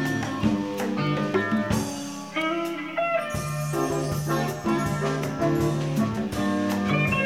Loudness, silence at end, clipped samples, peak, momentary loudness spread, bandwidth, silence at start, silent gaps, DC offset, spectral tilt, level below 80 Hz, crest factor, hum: -26 LUFS; 0 s; under 0.1%; -10 dBFS; 4 LU; 16 kHz; 0 s; none; 0.2%; -6 dB/octave; -48 dBFS; 16 dB; none